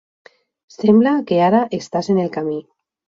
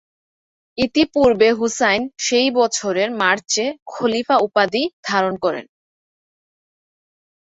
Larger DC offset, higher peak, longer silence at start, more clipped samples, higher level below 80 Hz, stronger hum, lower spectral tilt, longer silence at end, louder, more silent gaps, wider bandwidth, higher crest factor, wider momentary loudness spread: neither; about the same, -2 dBFS vs -2 dBFS; about the same, 0.8 s vs 0.75 s; neither; second, -64 dBFS vs -54 dBFS; neither; first, -7 dB/octave vs -3 dB/octave; second, 0.45 s vs 1.8 s; about the same, -17 LUFS vs -18 LUFS; second, none vs 3.82-3.86 s, 4.93-5.03 s; about the same, 7.6 kHz vs 8.2 kHz; about the same, 16 dB vs 18 dB; first, 11 LU vs 8 LU